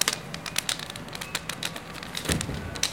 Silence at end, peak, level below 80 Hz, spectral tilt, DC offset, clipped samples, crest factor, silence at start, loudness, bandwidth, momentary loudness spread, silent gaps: 0 s; 0 dBFS; -46 dBFS; -2 dB/octave; 0.1%; under 0.1%; 32 dB; 0 s; -31 LUFS; 17 kHz; 7 LU; none